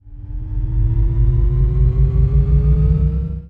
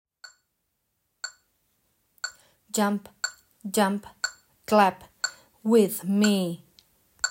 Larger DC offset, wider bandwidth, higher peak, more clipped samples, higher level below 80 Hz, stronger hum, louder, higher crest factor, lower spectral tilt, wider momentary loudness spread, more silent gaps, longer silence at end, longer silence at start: neither; second, 2.3 kHz vs 16.5 kHz; first, -4 dBFS vs -8 dBFS; neither; first, -16 dBFS vs -70 dBFS; neither; first, -17 LUFS vs -26 LUFS; second, 12 dB vs 20 dB; first, -12 dB/octave vs -4 dB/octave; second, 10 LU vs 18 LU; neither; about the same, 0 s vs 0 s; second, 0.05 s vs 1.25 s